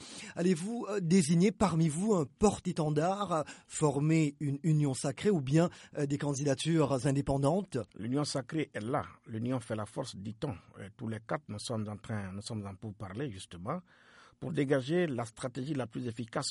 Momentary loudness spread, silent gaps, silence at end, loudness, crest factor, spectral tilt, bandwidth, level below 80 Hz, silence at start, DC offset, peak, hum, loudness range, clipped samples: 12 LU; none; 0 s; -33 LUFS; 20 dB; -6 dB/octave; 11.5 kHz; -60 dBFS; 0 s; under 0.1%; -14 dBFS; none; 10 LU; under 0.1%